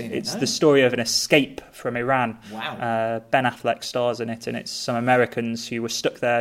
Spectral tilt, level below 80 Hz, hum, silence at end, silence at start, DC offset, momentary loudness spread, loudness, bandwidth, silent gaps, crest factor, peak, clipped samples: -4 dB/octave; -60 dBFS; none; 0 s; 0 s; under 0.1%; 11 LU; -23 LUFS; 16 kHz; none; 22 dB; 0 dBFS; under 0.1%